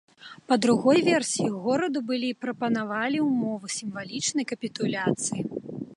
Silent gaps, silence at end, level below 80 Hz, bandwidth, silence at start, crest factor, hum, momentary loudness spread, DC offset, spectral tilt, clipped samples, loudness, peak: none; 0 s; -70 dBFS; 11.5 kHz; 0.2 s; 18 dB; none; 11 LU; under 0.1%; -4 dB/octave; under 0.1%; -26 LUFS; -8 dBFS